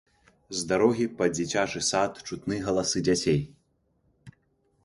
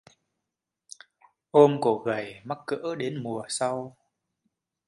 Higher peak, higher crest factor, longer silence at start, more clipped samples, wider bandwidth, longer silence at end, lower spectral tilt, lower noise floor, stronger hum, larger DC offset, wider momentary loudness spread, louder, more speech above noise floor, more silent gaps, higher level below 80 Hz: second, -8 dBFS vs -4 dBFS; about the same, 20 dB vs 24 dB; second, 0.5 s vs 1.55 s; neither; about the same, 11.5 kHz vs 11.5 kHz; second, 0.55 s vs 1 s; second, -4 dB/octave vs -5.5 dB/octave; second, -70 dBFS vs -86 dBFS; neither; neither; second, 9 LU vs 24 LU; about the same, -27 LUFS vs -26 LUFS; second, 44 dB vs 61 dB; neither; first, -56 dBFS vs -74 dBFS